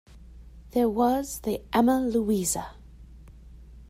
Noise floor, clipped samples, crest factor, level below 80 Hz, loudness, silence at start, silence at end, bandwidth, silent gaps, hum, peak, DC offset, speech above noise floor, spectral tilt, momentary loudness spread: -47 dBFS; under 0.1%; 18 dB; -48 dBFS; -26 LUFS; 0.1 s; 0.05 s; 16 kHz; none; none; -10 dBFS; under 0.1%; 22 dB; -5 dB/octave; 9 LU